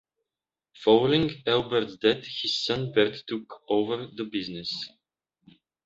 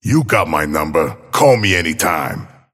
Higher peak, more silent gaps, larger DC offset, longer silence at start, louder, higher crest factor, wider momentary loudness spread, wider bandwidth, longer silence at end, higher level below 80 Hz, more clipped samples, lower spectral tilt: second, -6 dBFS vs 0 dBFS; neither; neither; first, 0.8 s vs 0.05 s; second, -26 LUFS vs -15 LUFS; first, 22 dB vs 16 dB; first, 13 LU vs 8 LU; second, 7.8 kHz vs 16.5 kHz; first, 1 s vs 0.25 s; second, -62 dBFS vs -40 dBFS; neither; about the same, -5.5 dB/octave vs -4.5 dB/octave